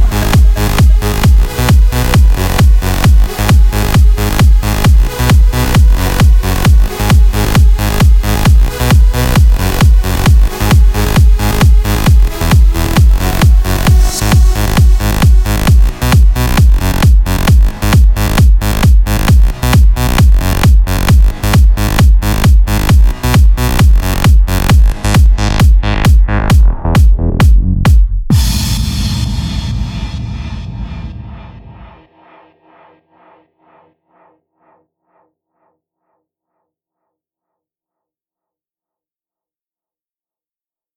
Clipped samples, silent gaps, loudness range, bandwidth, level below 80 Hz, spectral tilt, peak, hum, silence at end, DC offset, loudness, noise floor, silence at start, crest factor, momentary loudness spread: under 0.1%; none; 4 LU; 17 kHz; -10 dBFS; -5.5 dB/octave; 0 dBFS; none; 9.1 s; under 0.1%; -10 LUFS; under -90 dBFS; 0 s; 8 dB; 2 LU